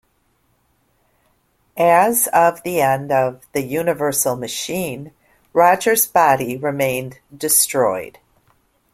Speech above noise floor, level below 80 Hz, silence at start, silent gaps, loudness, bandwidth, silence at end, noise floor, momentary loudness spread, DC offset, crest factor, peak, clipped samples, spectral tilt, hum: 46 dB; -58 dBFS; 1.75 s; none; -17 LUFS; 16.5 kHz; 0.85 s; -63 dBFS; 13 LU; under 0.1%; 18 dB; 0 dBFS; under 0.1%; -3 dB/octave; none